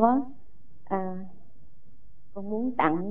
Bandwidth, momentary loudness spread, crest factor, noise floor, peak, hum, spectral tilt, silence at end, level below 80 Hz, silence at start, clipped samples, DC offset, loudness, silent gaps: 3.9 kHz; 18 LU; 22 dB; -58 dBFS; -6 dBFS; 50 Hz at -65 dBFS; -10 dB/octave; 0 s; -60 dBFS; 0 s; under 0.1%; 2%; -29 LUFS; none